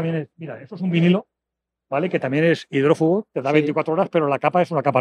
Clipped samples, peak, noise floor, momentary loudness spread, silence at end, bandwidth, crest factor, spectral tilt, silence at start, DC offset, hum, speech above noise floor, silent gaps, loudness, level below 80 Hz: under 0.1%; -4 dBFS; -84 dBFS; 10 LU; 0 s; 9.6 kHz; 16 dB; -8 dB/octave; 0 s; under 0.1%; none; 64 dB; none; -20 LUFS; -74 dBFS